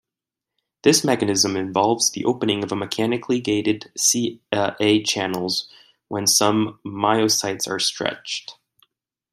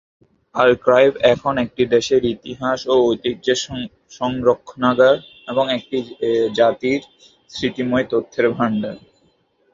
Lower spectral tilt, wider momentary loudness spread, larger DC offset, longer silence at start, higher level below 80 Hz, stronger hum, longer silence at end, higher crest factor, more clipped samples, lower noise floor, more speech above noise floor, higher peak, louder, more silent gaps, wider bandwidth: second, -3 dB/octave vs -5 dB/octave; about the same, 9 LU vs 11 LU; neither; first, 0.85 s vs 0.55 s; second, -64 dBFS vs -52 dBFS; neither; about the same, 0.8 s vs 0.75 s; about the same, 20 dB vs 18 dB; neither; first, -87 dBFS vs -61 dBFS; first, 66 dB vs 43 dB; about the same, -2 dBFS vs 0 dBFS; about the same, -20 LUFS vs -18 LUFS; neither; first, 16 kHz vs 7.6 kHz